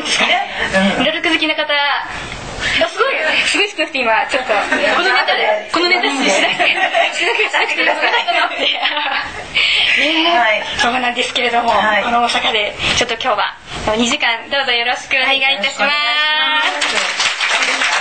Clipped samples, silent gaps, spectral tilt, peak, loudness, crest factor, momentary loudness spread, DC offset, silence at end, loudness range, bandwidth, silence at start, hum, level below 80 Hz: under 0.1%; none; -2 dB/octave; -2 dBFS; -14 LUFS; 14 dB; 4 LU; 0.5%; 0 s; 2 LU; 9.2 kHz; 0 s; none; -44 dBFS